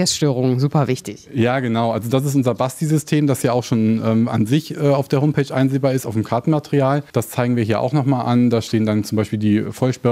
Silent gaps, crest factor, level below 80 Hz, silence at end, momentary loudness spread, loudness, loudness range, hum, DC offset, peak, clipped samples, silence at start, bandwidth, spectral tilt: none; 14 dB; -58 dBFS; 0 s; 4 LU; -18 LUFS; 1 LU; none; under 0.1%; -2 dBFS; under 0.1%; 0 s; 16 kHz; -6.5 dB/octave